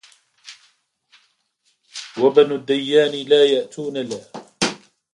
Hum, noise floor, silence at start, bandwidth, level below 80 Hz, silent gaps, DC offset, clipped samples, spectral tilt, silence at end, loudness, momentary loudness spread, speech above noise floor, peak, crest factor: none; -67 dBFS; 0.45 s; 11 kHz; -68 dBFS; none; under 0.1%; under 0.1%; -4 dB/octave; 0.35 s; -18 LUFS; 19 LU; 50 dB; 0 dBFS; 20 dB